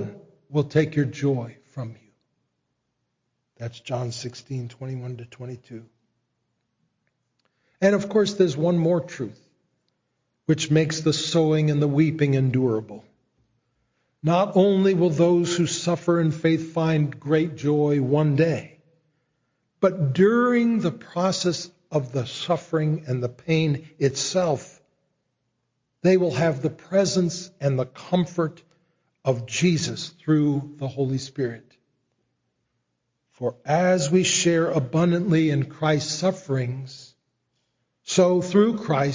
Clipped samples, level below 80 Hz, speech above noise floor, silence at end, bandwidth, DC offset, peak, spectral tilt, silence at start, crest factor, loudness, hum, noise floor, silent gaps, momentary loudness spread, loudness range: under 0.1%; -62 dBFS; 55 dB; 0 s; 7.6 kHz; under 0.1%; -6 dBFS; -6 dB/octave; 0 s; 18 dB; -23 LUFS; none; -77 dBFS; none; 14 LU; 11 LU